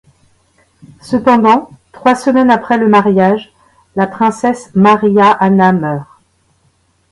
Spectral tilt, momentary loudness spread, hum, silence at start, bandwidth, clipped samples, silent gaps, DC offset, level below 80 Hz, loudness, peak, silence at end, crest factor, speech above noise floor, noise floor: -7 dB/octave; 9 LU; none; 1.05 s; 11.5 kHz; under 0.1%; none; under 0.1%; -52 dBFS; -11 LUFS; 0 dBFS; 1.1 s; 12 dB; 46 dB; -56 dBFS